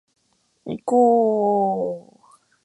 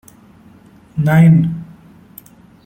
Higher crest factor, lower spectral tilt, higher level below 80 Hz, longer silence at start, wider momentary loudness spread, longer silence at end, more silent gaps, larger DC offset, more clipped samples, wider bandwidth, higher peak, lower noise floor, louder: about the same, 16 dB vs 14 dB; about the same, -8.5 dB/octave vs -9 dB/octave; second, -68 dBFS vs -48 dBFS; second, 0.65 s vs 0.95 s; about the same, 18 LU vs 18 LU; second, 0.65 s vs 1.05 s; neither; neither; neither; second, 10.5 kHz vs 14 kHz; second, -6 dBFS vs -2 dBFS; first, -67 dBFS vs -44 dBFS; second, -20 LUFS vs -12 LUFS